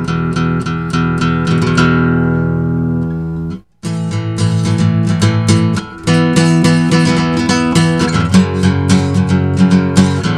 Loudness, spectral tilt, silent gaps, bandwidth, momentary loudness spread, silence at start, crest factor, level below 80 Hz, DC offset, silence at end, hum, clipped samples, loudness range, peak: -13 LUFS; -6 dB/octave; none; 11.5 kHz; 8 LU; 0 s; 12 dB; -30 dBFS; 0.2%; 0 s; none; under 0.1%; 4 LU; 0 dBFS